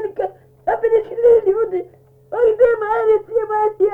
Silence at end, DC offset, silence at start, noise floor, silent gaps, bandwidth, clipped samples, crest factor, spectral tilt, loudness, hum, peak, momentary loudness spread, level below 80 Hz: 0 s; under 0.1%; 0 s; -44 dBFS; none; 3.4 kHz; under 0.1%; 14 dB; -7.5 dB/octave; -17 LUFS; none; -2 dBFS; 13 LU; -52 dBFS